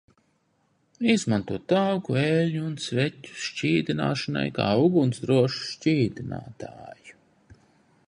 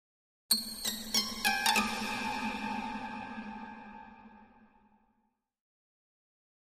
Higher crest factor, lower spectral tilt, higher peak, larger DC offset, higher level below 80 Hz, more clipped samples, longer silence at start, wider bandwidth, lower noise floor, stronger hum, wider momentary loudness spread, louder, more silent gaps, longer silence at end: second, 18 dB vs 24 dB; first, -6 dB/octave vs -1 dB/octave; first, -8 dBFS vs -14 dBFS; neither; about the same, -60 dBFS vs -62 dBFS; neither; first, 1 s vs 0.5 s; second, 11 kHz vs 15.5 kHz; second, -69 dBFS vs -78 dBFS; neither; second, 14 LU vs 19 LU; first, -25 LUFS vs -32 LUFS; neither; second, 0.95 s vs 2.05 s